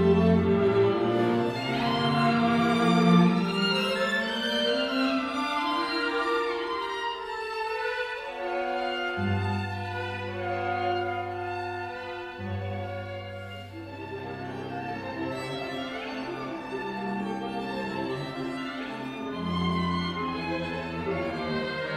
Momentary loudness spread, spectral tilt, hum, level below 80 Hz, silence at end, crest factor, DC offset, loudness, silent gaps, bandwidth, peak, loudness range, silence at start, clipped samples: 12 LU; -6.5 dB/octave; none; -60 dBFS; 0 s; 20 dB; under 0.1%; -28 LUFS; none; 13 kHz; -8 dBFS; 11 LU; 0 s; under 0.1%